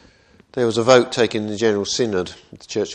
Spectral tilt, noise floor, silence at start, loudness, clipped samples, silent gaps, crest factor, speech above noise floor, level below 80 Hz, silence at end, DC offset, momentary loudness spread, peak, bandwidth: -4 dB/octave; -52 dBFS; 0.55 s; -19 LUFS; under 0.1%; none; 20 dB; 33 dB; -56 dBFS; 0 s; under 0.1%; 13 LU; 0 dBFS; 10 kHz